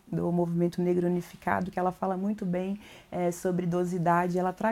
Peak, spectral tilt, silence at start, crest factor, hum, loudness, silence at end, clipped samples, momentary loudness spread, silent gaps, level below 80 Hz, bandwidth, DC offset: -10 dBFS; -7.5 dB/octave; 0.1 s; 18 dB; none; -29 LUFS; 0 s; under 0.1%; 6 LU; none; -62 dBFS; 14.5 kHz; under 0.1%